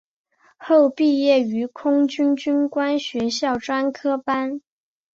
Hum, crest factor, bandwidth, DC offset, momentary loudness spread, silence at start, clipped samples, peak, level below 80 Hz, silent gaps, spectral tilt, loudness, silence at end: none; 14 dB; 7.8 kHz; under 0.1%; 7 LU; 0.6 s; under 0.1%; -6 dBFS; -64 dBFS; none; -4.5 dB/octave; -20 LUFS; 0.55 s